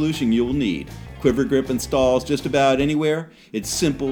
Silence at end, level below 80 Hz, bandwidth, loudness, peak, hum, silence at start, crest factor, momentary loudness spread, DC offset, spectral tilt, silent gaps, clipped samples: 0 s; -40 dBFS; 19.5 kHz; -21 LUFS; -4 dBFS; none; 0 s; 16 dB; 10 LU; under 0.1%; -5 dB/octave; none; under 0.1%